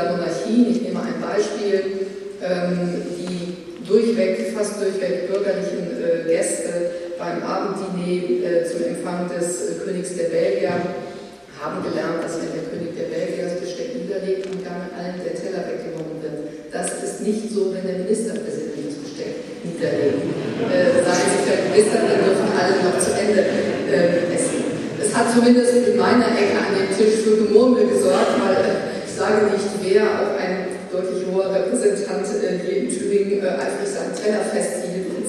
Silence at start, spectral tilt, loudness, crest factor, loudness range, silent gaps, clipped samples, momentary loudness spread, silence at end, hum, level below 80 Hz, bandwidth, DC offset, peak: 0 s; -5 dB/octave; -21 LUFS; 18 dB; 9 LU; none; under 0.1%; 12 LU; 0 s; none; -62 dBFS; 13.5 kHz; under 0.1%; -2 dBFS